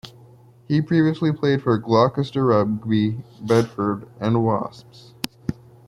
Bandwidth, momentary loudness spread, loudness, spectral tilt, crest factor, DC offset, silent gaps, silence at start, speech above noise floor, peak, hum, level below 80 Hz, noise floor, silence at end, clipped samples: 16 kHz; 14 LU; -21 LUFS; -7.5 dB/octave; 20 dB; under 0.1%; none; 0.05 s; 28 dB; -2 dBFS; none; -54 dBFS; -49 dBFS; 0.35 s; under 0.1%